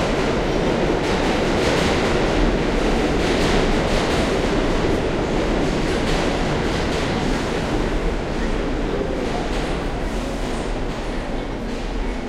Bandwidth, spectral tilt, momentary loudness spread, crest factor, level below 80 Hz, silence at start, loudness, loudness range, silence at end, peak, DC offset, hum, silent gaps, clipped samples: 13 kHz; -5.5 dB/octave; 7 LU; 16 dB; -26 dBFS; 0 s; -21 LUFS; 5 LU; 0 s; -4 dBFS; under 0.1%; none; none; under 0.1%